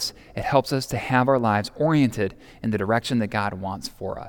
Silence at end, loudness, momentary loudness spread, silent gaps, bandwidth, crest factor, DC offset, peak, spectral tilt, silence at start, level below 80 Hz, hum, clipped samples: 0 s; -24 LUFS; 11 LU; none; 18.5 kHz; 20 dB; under 0.1%; -4 dBFS; -6 dB/octave; 0 s; -50 dBFS; none; under 0.1%